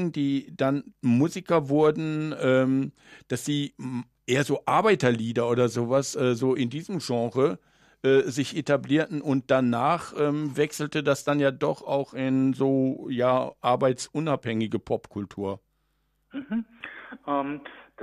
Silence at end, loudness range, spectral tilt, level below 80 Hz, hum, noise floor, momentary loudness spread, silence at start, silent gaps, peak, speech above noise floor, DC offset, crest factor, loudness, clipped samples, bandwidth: 0 s; 4 LU; -6 dB/octave; -66 dBFS; none; -72 dBFS; 11 LU; 0 s; none; -8 dBFS; 46 dB; under 0.1%; 18 dB; -26 LUFS; under 0.1%; 14 kHz